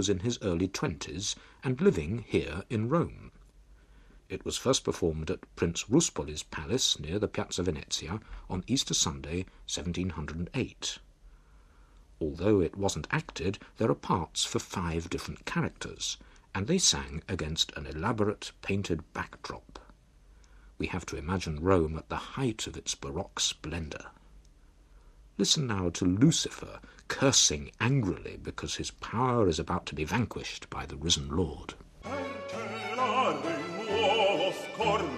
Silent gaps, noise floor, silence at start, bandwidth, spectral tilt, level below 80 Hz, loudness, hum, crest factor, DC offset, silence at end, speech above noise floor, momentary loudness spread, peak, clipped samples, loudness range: none; -58 dBFS; 0 s; 14 kHz; -4 dB/octave; -50 dBFS; -31 LUFS; none; 22 dB; under 0.1%; 0 s; 27 dB; 12 LU; -10 dBFS; under 0.1%; 6 LU